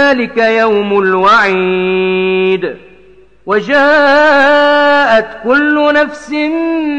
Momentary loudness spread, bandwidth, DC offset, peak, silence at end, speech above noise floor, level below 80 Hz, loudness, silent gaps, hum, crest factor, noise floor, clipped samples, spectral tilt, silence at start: 8 LU; 9 kHz; under 0.1%; -2 dBFS; 0 s; 33 dB; -48 dBFS; -10 LUFS; none; none; 8 dB; -43 dBFS; under 0.1%; -5.5 dB/octave; 0 s